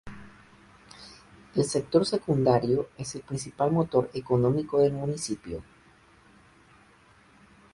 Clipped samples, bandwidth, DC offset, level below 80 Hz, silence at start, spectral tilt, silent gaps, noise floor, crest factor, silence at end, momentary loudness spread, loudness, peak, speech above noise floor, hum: under 0.1%; 11.5 kHz; under 0.1%; -58 dBFS; 0.05 s; -6.5 dB/octave; none; -58 dBFS; 20 dB; 2.1 s; 23 LU; -27 LUFS; -8 dBFS; 32 dB; none